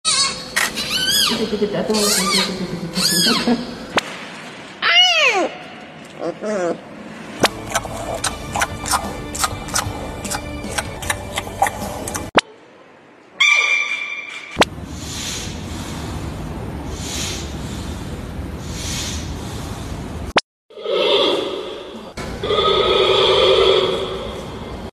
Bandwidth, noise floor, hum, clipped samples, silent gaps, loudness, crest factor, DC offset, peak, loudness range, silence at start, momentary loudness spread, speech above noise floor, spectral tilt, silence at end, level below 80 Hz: 14.5 kHz; -46 dBFS; none; under 0.1%; 20.44-20.69 s; -19 LUFS; 20 dB; under 0.1%; 0 dBFS; 10 LU; 0.05 s; 16 LU; 26 dB; -2.5 dB/octave; 0 s; -38 dBFS